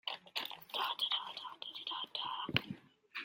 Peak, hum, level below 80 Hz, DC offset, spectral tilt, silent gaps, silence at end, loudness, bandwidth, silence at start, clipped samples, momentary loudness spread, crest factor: -12 dBFS; none; -76 dBFS; under 0.1%; -3.5 dB/octave; none; 0 s; -39 LUFS; 16.5 kHz; 0.05 s; under 0.1%; 11 LU; 30 dB